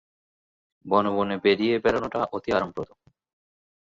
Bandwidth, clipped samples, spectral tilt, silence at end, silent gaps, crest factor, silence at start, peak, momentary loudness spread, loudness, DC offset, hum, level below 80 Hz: 7.6 kHz; under 0.1%; -6.5 dB/octave; 1.1 s; none; 20 dB; 0.85 s; -6 dBFS; 10 LU; -24 LUFS; under 0.1%; none; -58 dBFS